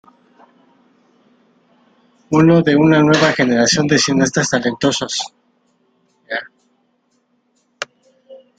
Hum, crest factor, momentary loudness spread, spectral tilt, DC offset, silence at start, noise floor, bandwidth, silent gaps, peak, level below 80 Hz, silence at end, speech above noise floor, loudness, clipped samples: none; 18 dB; 18 LU; -4.5 dB/octave; under 0.1%; 2.3 s; -63 dBFS; 9.4 kHz; none; 0 dBFS; -54 dBFS; 0.2 s; 50 dB; -14 LUFS; under 0.1%